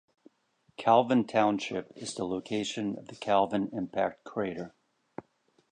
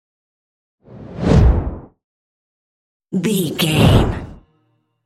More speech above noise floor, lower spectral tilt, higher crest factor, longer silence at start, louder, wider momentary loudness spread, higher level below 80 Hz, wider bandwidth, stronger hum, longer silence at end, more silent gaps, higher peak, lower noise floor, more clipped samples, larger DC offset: second, 41 dB vs 49 dB; about the same, -5 dB/octave vs -6 dB/octave; about the same, 22 dB vs 18 dB; about the same, 0.8 s vs 0.9 s; second, -30 LUFS vs -16 LUFS; about the same, 22 LU vs 20 LU; second, -70 dBFS vs -24 dBFS; second, 10 kHz vs 16 kHz; neither; second, 0.5 s vs 0.7 s; second, none vs 2.04-3.00 s; second, -8 dBFS vs 0 dBFS; first, -71 dBFS vs -64 dBFS; neither; neither